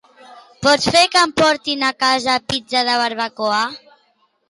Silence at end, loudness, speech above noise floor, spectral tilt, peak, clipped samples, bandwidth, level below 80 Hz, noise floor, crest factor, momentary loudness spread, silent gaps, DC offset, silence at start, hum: 0.75 s; -16 LUFS; 45 dB; -2.5 dB/octave; -2 dBFS; under 0.1%; 11.5 kHz; -52 dBFS; -61 dBFS; 16 dB; 8 LU; none; under 0.1%; 0.3 s; none